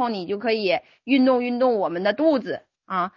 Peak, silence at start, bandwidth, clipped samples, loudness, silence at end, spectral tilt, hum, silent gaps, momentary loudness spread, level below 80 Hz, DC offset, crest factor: -8 dBFS; 0 s; 6 kHz; under 0.1%; -22 LUFS; 0.1 s; -7.5 dB/octave; none; none; 8 LU; -68 dBFS; under 0.1%; 14 dB